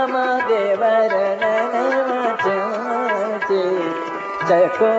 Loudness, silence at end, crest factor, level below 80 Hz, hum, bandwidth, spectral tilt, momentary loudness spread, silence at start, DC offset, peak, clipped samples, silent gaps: -19 LUFS; 0 s; 14 dB; -72 dBFS; none; 8 kHz; -3 dB/octave; 6 LU; 0 s; under 0.1%; -4 dBFS; under 0.1%; none